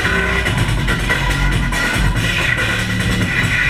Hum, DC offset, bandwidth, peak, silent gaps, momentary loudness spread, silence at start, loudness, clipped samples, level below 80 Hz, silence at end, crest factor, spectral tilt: none; 0.7%; 15.5 kHz; -2 dBFS; none; 2 LU; 0 s; -16 LUFS; under 0.1%; -22 dBFS; 0 s; 14 dB; -4.5 dB/octave